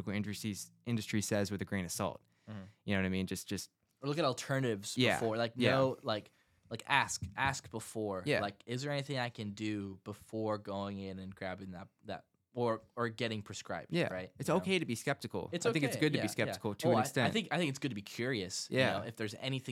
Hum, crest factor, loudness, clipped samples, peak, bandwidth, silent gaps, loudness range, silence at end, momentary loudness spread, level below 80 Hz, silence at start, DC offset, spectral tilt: none; 24 dB; -36 LUFS; under 0.1%; -12 dBFS; 16.5 kHz; none; 7 LU; 0 s; 12 LU; -70 dBFS; 0 s; under 0.1%; -4.5 dB/octave